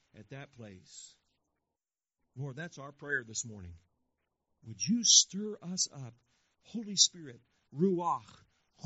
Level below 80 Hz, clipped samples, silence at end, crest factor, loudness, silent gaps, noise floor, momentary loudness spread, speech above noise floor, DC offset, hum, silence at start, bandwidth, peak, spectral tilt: -74 dBFS; under 0.1%; 0.6 s; 28 dB; -29 LUFS; none; under -90 dBFS; 28 LU; over 56 dB; under 0.1%; none; 0.15 s; 8 kHz; -8 dBFS; -2.5 dB/octave